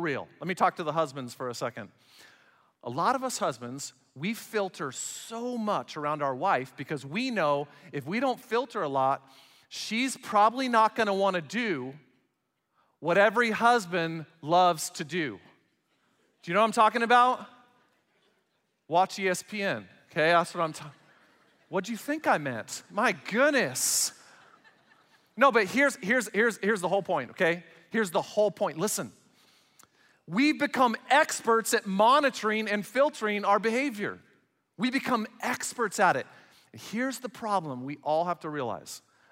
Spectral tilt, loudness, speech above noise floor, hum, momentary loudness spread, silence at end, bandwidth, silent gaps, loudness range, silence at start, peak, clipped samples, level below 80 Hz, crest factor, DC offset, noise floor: -3.5 dB/octave; -28 LUFS; 51 dB; none; 13 LU; 0.35 s; 16 kHz; none; 6 LU; 0 s; -8 dBFS; under 0.1%; -80 dBFS; 20 dB; under 0.1%; -78 dBFS